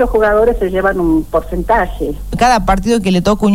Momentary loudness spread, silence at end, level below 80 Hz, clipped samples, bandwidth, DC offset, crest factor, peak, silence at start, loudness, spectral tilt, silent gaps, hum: 7 LU; 0 s; -24 dBFS; under 0.1%; 16.5 kHz; 2%; 12 dB; 0 dBFS; 0 s; -13 LUFS; -6 dB/octave; none; none